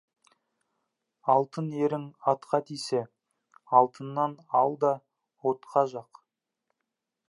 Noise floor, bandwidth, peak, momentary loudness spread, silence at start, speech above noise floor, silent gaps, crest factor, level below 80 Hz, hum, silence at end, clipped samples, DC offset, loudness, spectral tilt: -85 dBFS; 11.5 kHz; -6 dBFS; 9 LU; 1.25 s; 58 dB; none; 24 dB; -84 dBFS; none; 1.25 s; under 0.1%; under 0.1%; -28 LUFS; -6.5 dB/octave